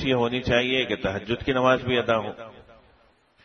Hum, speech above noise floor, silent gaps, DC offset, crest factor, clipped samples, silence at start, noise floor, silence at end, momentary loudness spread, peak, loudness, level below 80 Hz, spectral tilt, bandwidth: none; 36 dB; none; under 0.1%; 18 dB; under 0.1%; 0 s; -60 dBFS; 0.75 s; 12 LU; -6 dBFS; -24 LUFS; -48 dBFS; -6 dB/octave; 6.6 kHz